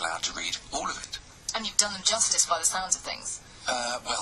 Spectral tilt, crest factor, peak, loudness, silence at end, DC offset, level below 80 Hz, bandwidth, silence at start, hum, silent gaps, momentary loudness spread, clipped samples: 0.5 dB/octave; 24 dB; -4 dBFS; -27 LUFS; 0 s; under 0.1%; -54 dBFS; 12.5 kHz; 0 s; none; none; 13 LU; under 0.1%